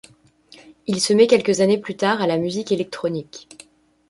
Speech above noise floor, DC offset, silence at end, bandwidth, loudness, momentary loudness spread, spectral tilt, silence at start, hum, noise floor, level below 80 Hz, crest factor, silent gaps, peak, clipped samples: 32 dB; under 0.1%; 0.7 s; 11.5 kHz; -19 LUFS; 16 LU; -4.5 dB/octave; 0.9 s; none; -51 dBFS; -62 dBFS; 18 dB; none; -2 dBFS; under 0.1%